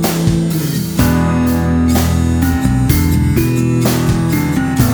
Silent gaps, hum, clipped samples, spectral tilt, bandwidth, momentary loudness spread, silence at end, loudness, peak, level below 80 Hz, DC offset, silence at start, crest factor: none; none; under 0.1%; -6 dB/octave; over 20 kHz; 2 LU; 0 s; -14 LUFS; 0 dBFS; -24 dBFS; under 0.1%; 0 s; 12 dB